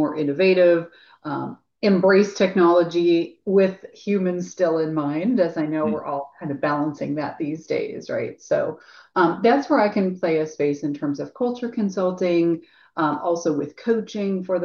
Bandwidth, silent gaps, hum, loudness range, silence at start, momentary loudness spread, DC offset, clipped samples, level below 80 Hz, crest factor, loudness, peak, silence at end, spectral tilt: 7 kHz; none; none; 5 LU; 0 s; 12 LU; under 0.1%; under 0.1%; -68 dBFS; 16 dB; -22 LUFS; -6 dBFS; 0 s; -6.5 dB/octave